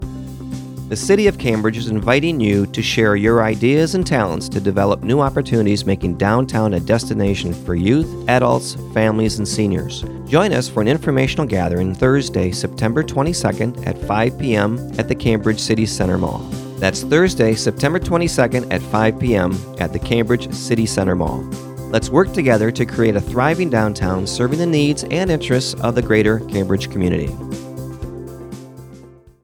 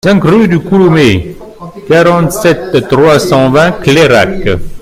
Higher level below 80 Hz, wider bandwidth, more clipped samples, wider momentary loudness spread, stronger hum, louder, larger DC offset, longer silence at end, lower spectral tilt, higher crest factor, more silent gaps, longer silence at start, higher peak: second, -36 dBFS vs -30 dBFS; about the same, 17.5 kHz vs 16 kHz; second, under 0.1% vs 2%; about the same, 10 LU vs 9 LU; neither; second, -17 LUFS vs -8 LUFS; neither; first, 0.35 s vs 0.05 s; about the same, -6 dB/octave vs -6 dB/octave; first, 18 dB vs 8 dB; neither; about the same, 0 s vs 0.05 s; about the same, 0 dBFS vs 0 dBFS